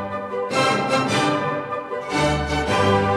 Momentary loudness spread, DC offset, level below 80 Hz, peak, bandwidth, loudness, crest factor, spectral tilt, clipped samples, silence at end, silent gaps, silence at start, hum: 8 LU; under 0.1%; -40 dBFS; -6 dBFS; 14 kHz; -21 LUFS; 16 dB; -5 dB/octave; under 0.1%; 0 s; none; 0 s; none